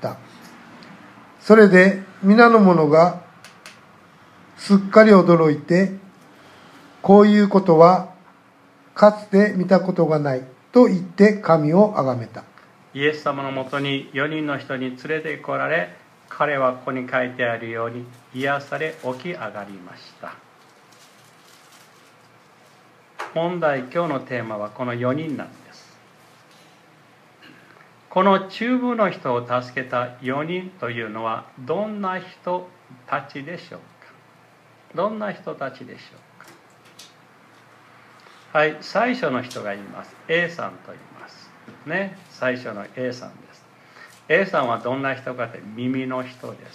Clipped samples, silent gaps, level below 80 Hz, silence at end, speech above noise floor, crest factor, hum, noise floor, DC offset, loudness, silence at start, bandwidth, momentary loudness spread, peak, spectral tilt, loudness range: under 0.1%; none; -72 dBFS; 0.2 s; 33 dB; 20 dB; none; -52 dBFS; under 0.1%; -19 LUFS; 0 s; 10.5 kHz; 21 LU; 0 dBFS; -7.5 dB/octave; 16 LU